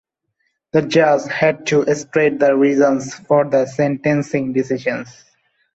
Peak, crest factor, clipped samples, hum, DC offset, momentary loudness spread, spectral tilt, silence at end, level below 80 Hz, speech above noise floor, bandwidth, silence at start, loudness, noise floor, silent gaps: -2 dBFS; 14 dB; under 0.1%; none; under 0.1%; 7 LU; -6 dB/octave; 0.65 s; -58 dBFS; 54 dB; 8.2 kHz; 0.75 s; -17 LUFS; -70 dBFS; none